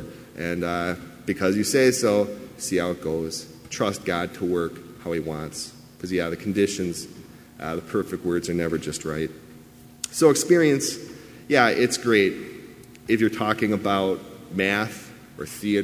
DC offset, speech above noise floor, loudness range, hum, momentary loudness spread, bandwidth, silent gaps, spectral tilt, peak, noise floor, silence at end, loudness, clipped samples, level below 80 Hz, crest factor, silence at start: under 0.1%; 24 dB; 7 LU; none; 18 LU; 16 kHz; none; -4.5 dB/octave; -2 dBFS; -47 dBFS; 0 s; -24 LUFS; under 0.1%; -52 dBFS; 22 dB; 0 s